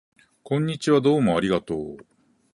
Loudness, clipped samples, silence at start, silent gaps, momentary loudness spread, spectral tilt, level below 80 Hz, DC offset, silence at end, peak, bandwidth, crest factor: -23 LUFS; under 0.1%; 0.45 s; none; 12 LU; -6.5 dB/octave; -54 dBFS; under 0.1%; 0.55 s; -8 dBFS; 11.5 kHz; 16 dB